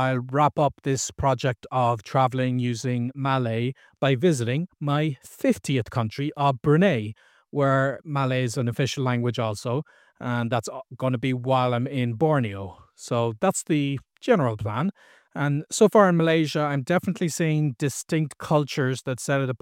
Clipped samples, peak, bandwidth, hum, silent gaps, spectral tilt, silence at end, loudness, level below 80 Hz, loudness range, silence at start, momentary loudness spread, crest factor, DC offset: under 0.1%; -4 dBFS; 16 kHz; none; none; -6 dB/octave; 0.05 s; -24 LUFS; -56 dBFS; 4 LU; 0 s; 8 LU; 20 dB; under 0.1%